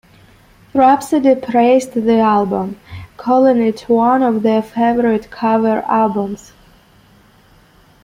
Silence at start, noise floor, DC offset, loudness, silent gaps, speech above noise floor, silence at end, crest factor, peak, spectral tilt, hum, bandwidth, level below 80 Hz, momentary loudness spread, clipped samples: 0.75 s; -48 dBFS; under 0.1%; -14 LUFS; none; 35 dB; 1.7 s; 14 dB; -2 dBFS; -6.5 dB/octave; none; 15.5 kHz; -52 dBFS; 10 LU; under 0.1%